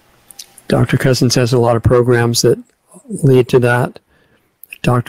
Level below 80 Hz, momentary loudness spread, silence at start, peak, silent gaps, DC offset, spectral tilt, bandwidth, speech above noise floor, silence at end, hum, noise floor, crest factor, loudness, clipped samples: -38 dBFS; 9 LU; 0.7 s; 0 dBFS; none; under 0.1%; -5.5 dB/octave; 16 kHz; 43 dB; 0.05 s; none; -55 dBFS; 14 dB; -13 LUFS; under 0.1%